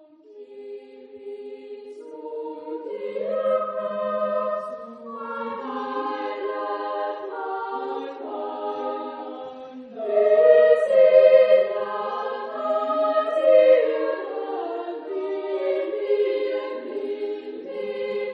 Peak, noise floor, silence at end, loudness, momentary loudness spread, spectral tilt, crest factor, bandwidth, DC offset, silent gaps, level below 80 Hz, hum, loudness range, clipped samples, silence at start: -2 dBFS; -46 dBFS; 0 s; -23 LUFS; 22 LU; -5.5 dB/octave; 20 dB; 5.2 kHz; under 0.1%; none; -80 dBFS; none; 12 LU; under 0.1%; 0.3 s